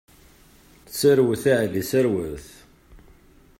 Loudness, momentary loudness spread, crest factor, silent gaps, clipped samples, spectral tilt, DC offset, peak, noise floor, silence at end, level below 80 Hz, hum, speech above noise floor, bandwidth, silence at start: -21 LUFS; 16 LU; 18 dB; none; under 0.1%; -5.5 dB/octave; under 0.1%; -6 dBFS; -53 dBFS; 0.65 s; -52 dBFS; none; 32 dB; 16.5 kHz; 0.9 s